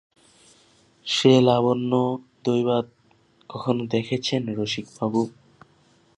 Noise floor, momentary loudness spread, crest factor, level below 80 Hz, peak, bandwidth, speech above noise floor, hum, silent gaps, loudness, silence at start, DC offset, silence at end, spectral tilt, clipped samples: -60 dBFS; 14 LU; 20 dB; -66 dBFS; -4 dBFS; 10.5 kHz; 38 dB; none; none; -23 LUFS; 1.05 s; under 0.1%; 0.9 s; -6 dB/octave; under 0.1%